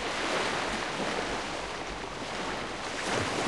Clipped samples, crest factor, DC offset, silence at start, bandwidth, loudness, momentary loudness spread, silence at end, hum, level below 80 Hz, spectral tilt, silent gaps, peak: under 0.1%; 16 dB; 0.2%; 0 s; 13 kHz; -32 LUFS; 7 LU; 0 s; none; -52 dBFS; -3 dB/octave; none; -18 dBFS